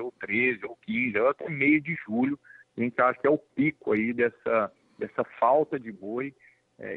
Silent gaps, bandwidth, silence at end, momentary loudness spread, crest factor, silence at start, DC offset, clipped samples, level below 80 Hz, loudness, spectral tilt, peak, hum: none; 4.2 kHz; 0 s; 12 LU; 18 dB; 0 s; under 0.1%; under 0.1%; -70 dBFS; -27 LUFS; -9 dB/octave; -10 dBFS; none